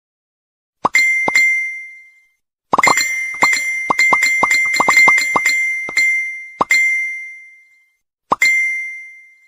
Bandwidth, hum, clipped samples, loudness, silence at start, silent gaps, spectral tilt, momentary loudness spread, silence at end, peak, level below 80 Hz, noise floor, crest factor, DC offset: 15.5 kHz; none; under 0.1%; -13 LUFS; 0.85 s; none; -0.5 dB/octave; 13 LU; 0.3 s; 0 dBFS; -58 dBFS; -62 dBFS; 16 dB; under 0.1%